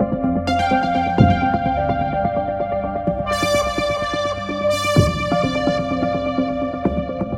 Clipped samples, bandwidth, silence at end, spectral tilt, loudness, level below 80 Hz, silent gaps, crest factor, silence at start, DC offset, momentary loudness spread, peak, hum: under 0.1%; 16 kHz; 0 s; -6 dB/octave; -19 LUFS; -36 dBFS; none; 18 dB; 0 s; under 0.1%; 6 LU; 0 dBFS; none